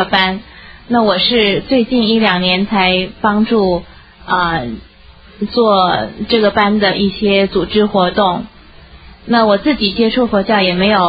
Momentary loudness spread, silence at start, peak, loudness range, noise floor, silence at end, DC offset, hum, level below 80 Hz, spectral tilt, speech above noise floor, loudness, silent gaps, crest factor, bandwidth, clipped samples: 7 LU; 0 s; 0 dBFS; 3 LU; -40 dBFS; 0 s; under 0.1%; none; -38 dBFS; -8 dB/octave; 28 dB; -13 LUFS; none; 14 dB; 5.6 kHz; under 0.1%